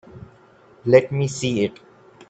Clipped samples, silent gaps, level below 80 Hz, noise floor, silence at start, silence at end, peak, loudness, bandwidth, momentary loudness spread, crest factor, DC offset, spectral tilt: under 0.1%; none; -58 dBFS; -51 dBFS; 0.15 s; 0.6 s; 0 dBFS; -20 LUFS; 9 kHz; 10 LU; 22 dB; under 0.1%; -6 dB/octave